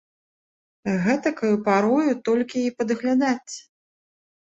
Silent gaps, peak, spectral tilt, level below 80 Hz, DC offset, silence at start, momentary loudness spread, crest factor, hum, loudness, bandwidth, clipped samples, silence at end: none; -6 dBFS; -6 dB/octave; -66 dBFS; under 0.1%; 0.85 s; 9 LU; 18 dB; none; -22 LUFS; 8 kHz; under 0.1%; 0.95 s